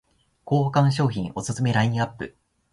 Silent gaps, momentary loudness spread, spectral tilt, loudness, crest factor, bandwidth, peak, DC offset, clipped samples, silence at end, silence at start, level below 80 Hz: none; 9 LU; -6.5 dB/octave; -23 LUFS; 18 dB; 11.5 kHz; -6 dBFS; under 0.1%; under 0.1%; 0.45 s; 0.45 s; -54 dBFS